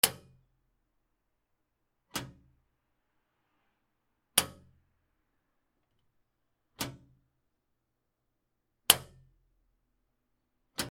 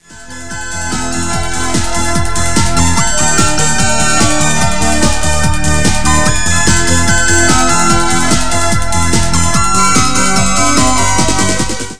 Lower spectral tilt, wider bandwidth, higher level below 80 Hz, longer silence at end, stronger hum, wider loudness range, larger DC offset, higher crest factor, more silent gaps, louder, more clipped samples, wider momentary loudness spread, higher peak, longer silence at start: second, -0.5 dB/octave vs -3 dB/octave; first, 16 kHz vs 11 kHz; second, -68 dBFS vs -22 dBFS; about the same, 0 s vs 0 s; neither; first, 16 LU vs 2 LU; second, under 0.1% vs 20%; first, 40 dB vs 14 dB; neither; second, -30 LUFS vs -11 LUFS; neither; first, 17 LU vs 7 LU; about the same, 0 dBFS vs 0 dBFS; about the same, 0.05 s vs 0 s